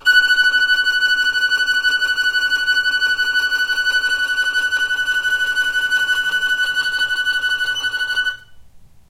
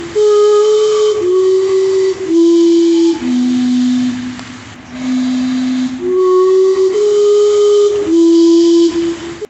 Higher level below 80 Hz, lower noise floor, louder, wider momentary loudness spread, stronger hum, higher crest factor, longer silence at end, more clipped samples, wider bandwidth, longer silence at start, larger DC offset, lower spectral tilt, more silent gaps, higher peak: about the same, -52 dBFS vs -50 dBFS; first, -42 dBFS vs -31 dBFS; second, -16 LUFS vs -11 LUFS; second, 5 LU vs 10 LU; neither; first, 14 dB vs 8 dB; first, 0.25 s vs 0.05 s; neither; first, 16 kHz vs 8.4 kHz; about the same, 0.05 s vs 0 s; neither; second, 1.5 dB/octave vs -4.5 dB/octave; neither; about the same, -4 dBFS vs -2 dBFS